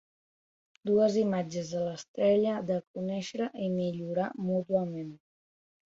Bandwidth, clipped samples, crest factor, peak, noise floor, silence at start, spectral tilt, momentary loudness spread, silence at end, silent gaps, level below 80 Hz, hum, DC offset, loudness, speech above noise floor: 7.8 kHz; under 0.1%; 16 dB; -16 dBFS; under -90 dBFS; 0.85 s; -7 dB/octave; 10 LU; 0.7 s; 2.08-2.14 s, 2.87-2.94 s; -70 dBFS; none; under 0.1%; -31 LUFS; over 60 dB